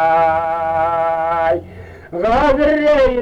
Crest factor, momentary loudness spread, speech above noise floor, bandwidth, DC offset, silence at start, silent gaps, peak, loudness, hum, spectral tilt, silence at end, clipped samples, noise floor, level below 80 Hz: 12 dB; 8 LU; 22 dB; 8.6 kHz; under 0.1%; 0 s; none; -4 dBFS; -15 LUFS; none; -6.5 dB/octave; 0 s; under 0.1%; -35 dBFS; -34 dBFS